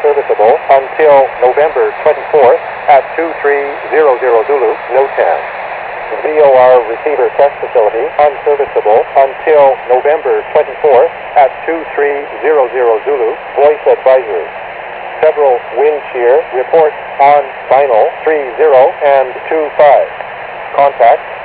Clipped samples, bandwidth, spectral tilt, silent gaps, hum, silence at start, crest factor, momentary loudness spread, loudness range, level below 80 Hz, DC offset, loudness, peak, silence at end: 0.6%; 4 kHz; -7.5 dB/octave; none; none; 0 s; 10 dB; 9 LU; 2 LU; -52 dBFS; under 0.1%; -10 LUFS; 0 dBFS; 0 s